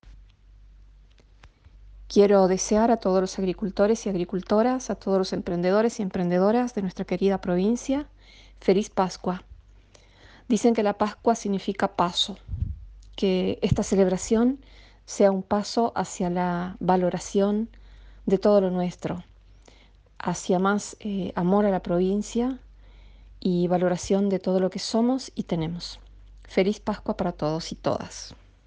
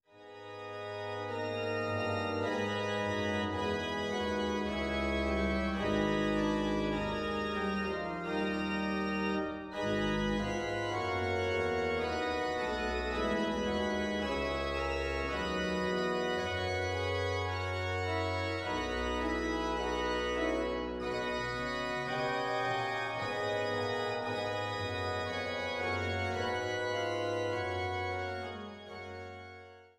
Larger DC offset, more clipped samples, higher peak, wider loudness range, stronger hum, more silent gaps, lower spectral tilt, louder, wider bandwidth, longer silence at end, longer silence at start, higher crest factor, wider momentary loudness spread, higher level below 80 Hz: neither; neither; first, -6 dBFS vs -18 dBFS; about the same, 4 LU vs 2 LU; neither; neither; about the same, -6 dB/octave vs -5.5 dB/octave; first, -25 LUFS vs -34 LUFS; second, 9.8 kHz vs 13.5 kHz; first, 0.3 s vs 0.15 s; about the same, 0.05 s vs 0.15 s; about the same, 20 dB vs 16 dB; first, 10 LU vs 5 LU; about the same, -48 dBFS vs -50 dBFS